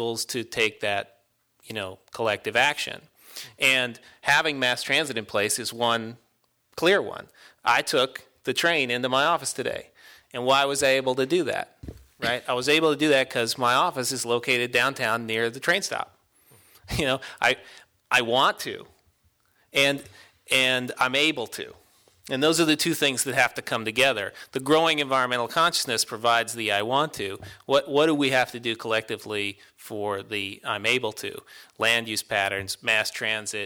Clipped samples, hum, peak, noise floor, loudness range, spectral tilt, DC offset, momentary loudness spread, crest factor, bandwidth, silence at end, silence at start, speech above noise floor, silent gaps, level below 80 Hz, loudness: under 0.1%; none; -8 dBFS; -67 dBFS; 3 LU; -2.5 dB/octave; under 0.1%; 13 LU; 18 dB; 19.5 kHz; 0 s; 0 s; 42 dB; none; -58 dBFS; -24 LUFS